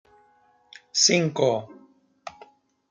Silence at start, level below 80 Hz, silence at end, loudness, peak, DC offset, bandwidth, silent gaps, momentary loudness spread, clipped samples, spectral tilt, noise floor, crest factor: 0.95 s; -74 dBFS; 0.6 s; -22 LUFS; -6 dBFS; under 0.1%; 11 kHz; none; 25 LU; under 0.1%; -3 dB/octave; -61 dBFS; 22 dB